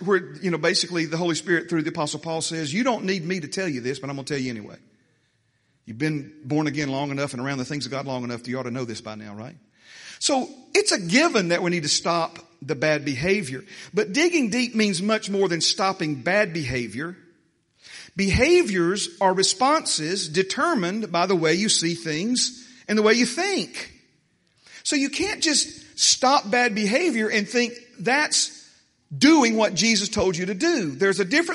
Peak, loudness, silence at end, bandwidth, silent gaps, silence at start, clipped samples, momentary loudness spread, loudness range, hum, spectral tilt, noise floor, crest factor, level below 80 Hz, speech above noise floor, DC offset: -4 dBFS; -22 LUFS; 0 s; 11.5 kHz; none; 0 s; under 0.1%; 12 LU; 8 LU; none; -3.5 dB/octave; -67 dBFS; 20 dB; -52 dBFS; 45 dB; under 0.1%